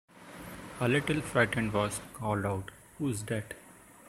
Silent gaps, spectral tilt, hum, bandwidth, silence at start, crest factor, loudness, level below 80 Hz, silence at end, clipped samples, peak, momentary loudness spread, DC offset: none; -5.5 dB/octave; none; 16 kHz; 0.15 s; 22 dB; -32 LUFS; -58 dBFS; 0 s; under 0.1%; -10 dBFS; 18 LU; under 0.1%